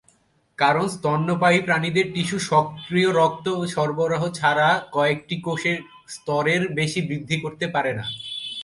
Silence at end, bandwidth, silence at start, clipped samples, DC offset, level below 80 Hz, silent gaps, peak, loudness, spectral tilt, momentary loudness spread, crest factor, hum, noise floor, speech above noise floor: 0 s; 11.5 kHz; 0.6 s; under 0.1%; under 0.1%; -60 dBFS; none; -2 dBFS; -22 LUFS; -5 dB/octave; 8 LU; 20 dB; none; -61 dBFS; 39 dB